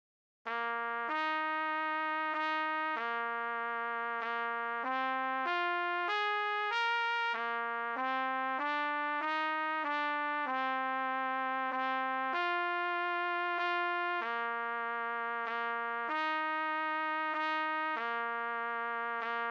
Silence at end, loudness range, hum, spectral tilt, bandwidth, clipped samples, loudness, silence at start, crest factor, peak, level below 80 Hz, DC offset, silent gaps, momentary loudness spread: 0 s; 2 LU; none; -2.5 dB/octave; 8 kHz; under 0.1%; -34 LUFS; 0.45 s; 12 dB; -22 dBFS; under -90 dBFS; under 0.1%; none; 3 LU